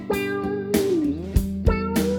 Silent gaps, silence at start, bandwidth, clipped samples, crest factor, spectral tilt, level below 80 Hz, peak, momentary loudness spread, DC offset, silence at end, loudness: none; 0 s; over 20 kHz; under 0.1%; 18 dB; -6.5 dB/octave; -30 dBFS; -6 dBFS; 4 LU; under 0.1%; 0 s; -24 LUFS